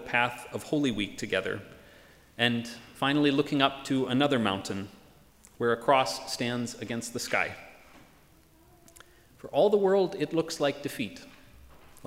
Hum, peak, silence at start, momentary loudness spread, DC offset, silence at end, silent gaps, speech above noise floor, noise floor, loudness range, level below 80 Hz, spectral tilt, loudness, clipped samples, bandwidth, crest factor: none; -8 dBFS; 0 s; 13 LU; under 0.1%; 0 s; none; 31 dB; -59 dBFS; 3 LU; -62 dBFS; -4.5 dB/octave; -28 LUFS; under 0.1%; 16 kHz; 22 dB